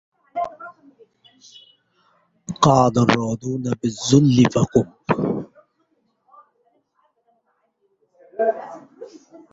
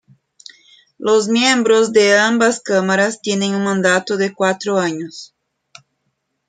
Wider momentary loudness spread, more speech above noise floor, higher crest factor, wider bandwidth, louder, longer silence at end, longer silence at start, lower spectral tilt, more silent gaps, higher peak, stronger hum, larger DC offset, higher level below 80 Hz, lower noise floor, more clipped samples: first, 25 LU vs 9 LU; second, 50 dB vs 55 dB; about the same, 20 dB vs 16 dB; second, 8 kHz vs 9.6 kHz; second, -19 LUFS vs -15 LUFS; second, 0.5 s vs 1.25 s; second, 0.35 s vs 1 s; first, -6 dB/octave vs -3.5 dB/octave; neither; about the same, -2 dBFS vs -2 dBFS; neither; neither; first, -52 dBFS vs -66 dBFS; about the same, -68 dBFS vs -71 dBFS; neither